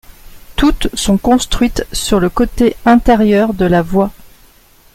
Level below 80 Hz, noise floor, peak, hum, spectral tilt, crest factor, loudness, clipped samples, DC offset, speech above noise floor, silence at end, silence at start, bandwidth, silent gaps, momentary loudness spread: -26 dBFS; -45 dBFS; 0 dBFS; none; -5 dB/octave; 12 dB; -13 LUFS; under 0.1%; under 0.1%; 34 dB; 0.85 s; 0.25 s; 16 kHz; none; 6 LU